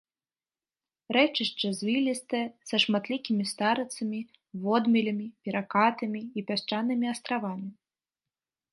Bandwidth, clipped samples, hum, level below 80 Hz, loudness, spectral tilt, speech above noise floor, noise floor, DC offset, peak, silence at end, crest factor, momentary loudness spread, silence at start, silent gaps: 11.5 kHz; under 0.1%; none; -80 dBFS; -28 LUFS; -4.5 dB/octave; over 62 dB; under -90 dBFS; under 0.1%; -8 dBFS; 1 s; 20 dB; 10 LU; 1.1 s; none